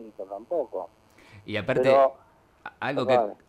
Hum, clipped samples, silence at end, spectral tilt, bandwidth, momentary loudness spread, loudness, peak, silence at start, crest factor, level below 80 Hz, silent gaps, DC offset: none; under 0.1%; 0.15 s; -6.5 dB/octave; 9.6 kHz; 24 LU; -25 LUFS; -8 dBFS; 0 s; 18 dB; -64 dBFS; none; under 0.1%